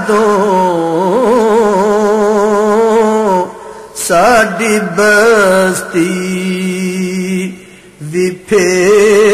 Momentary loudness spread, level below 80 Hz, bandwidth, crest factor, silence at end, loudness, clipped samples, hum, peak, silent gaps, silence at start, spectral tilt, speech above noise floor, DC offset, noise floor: 9 LU; -46 dBFS; 14 kHz; 10 dB; 0 s; -11 LUFS; under 0.1%; none; 0 dBFS; none; 0 s; -4.5 dB/octave; 24 dB; under 0.1%; -34 dBFS